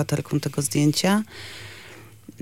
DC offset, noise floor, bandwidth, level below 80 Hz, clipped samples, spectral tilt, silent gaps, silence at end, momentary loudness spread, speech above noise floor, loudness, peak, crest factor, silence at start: under 0.1%; -45 dBFS; 16.5 kHz; -58 dBFS; under 0.1%; -5 dB/octave; none; 0.1 s; 22 LU; 22 dB; -23 LUFS; -8 dBFS; 16 dB; 0 s